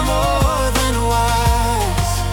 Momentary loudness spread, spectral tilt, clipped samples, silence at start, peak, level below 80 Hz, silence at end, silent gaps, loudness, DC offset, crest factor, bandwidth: 2 LU; -4.5 dB/octave; under 0.1%; 0 s; -4 dBFS; -22 dBFS; 0 s; none; -17 LUFS; under 0.1%; 12 dB; 18 kHz